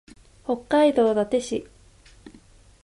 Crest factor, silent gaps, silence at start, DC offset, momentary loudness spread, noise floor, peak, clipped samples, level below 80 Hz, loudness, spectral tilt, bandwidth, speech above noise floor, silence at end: 16 dB; none; 0.5 s; under 0.1%; 13 LU; -52 dBFS; -8 dBFS; under 0.1%; -56 dBFS; -22 LUFS; -5 dB/octave; 11.5 kHz; 31 dB; 0.55 s